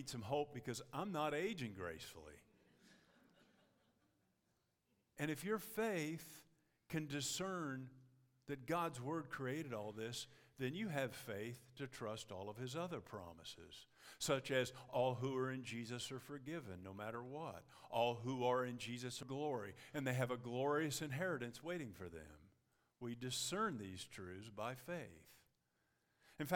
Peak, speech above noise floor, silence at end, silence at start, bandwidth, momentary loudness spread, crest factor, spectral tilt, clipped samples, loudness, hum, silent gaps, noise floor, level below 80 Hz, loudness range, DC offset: -22 dBFS; 39 dB; 0 s; 0 s; 18 kHz; 14 LU; 24 dB; -4.5 dB/octave; under 0.1%; -45 LUFS; none; none; -84 dBFS; -78 dBFS; 5 LU; under 0.1%